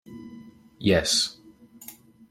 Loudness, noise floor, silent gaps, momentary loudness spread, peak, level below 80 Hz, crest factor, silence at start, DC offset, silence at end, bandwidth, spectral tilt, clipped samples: -23 LUFS; -50 dBFS; none; 24 LU; -8 dBFS; -54 dBFS; 22 dB; 0.1 s; under 0.1%; 0.4 s; 16.5 kHz; -3 dB/octave; under 0.1%